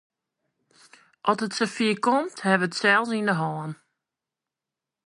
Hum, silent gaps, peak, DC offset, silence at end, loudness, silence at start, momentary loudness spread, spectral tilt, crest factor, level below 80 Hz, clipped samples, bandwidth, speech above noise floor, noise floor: none; none; -6 dBFS; under 0.1%; 1.3 s; -24 LUFS; 1.25 s; 10 LU; -4.5 dB/octave; 22 dB; -78 dBFS; under 0.1%; 11.5 kHz; 64 dB; -88 dBFS